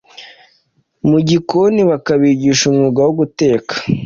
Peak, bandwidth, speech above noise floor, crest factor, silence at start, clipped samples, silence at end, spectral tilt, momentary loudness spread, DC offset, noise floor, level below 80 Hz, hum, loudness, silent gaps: -2 dBFS; 7.6 kHz; 47 dB; 12 dB; 0.2 s; under 0.1%; 0 s; -5.5 dB/octave; 3 LU; under 0.1%; -59 dBFS; -50 dBFS; none; -13 LUFS; none